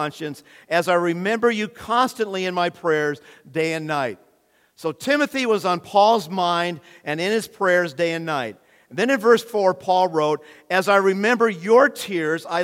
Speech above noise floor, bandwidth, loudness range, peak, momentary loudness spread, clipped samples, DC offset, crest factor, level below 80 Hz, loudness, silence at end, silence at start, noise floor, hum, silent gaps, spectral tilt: 40 dB; 16.5 kHz; 5 LU; -2 dBFS; 12 LU; under 0.1%; under 0.1%; 18 dB; -70 dBFS; -21 LUFS; 0 s; 0 s; -61 dBFS; none; none; -4.5 dB/octave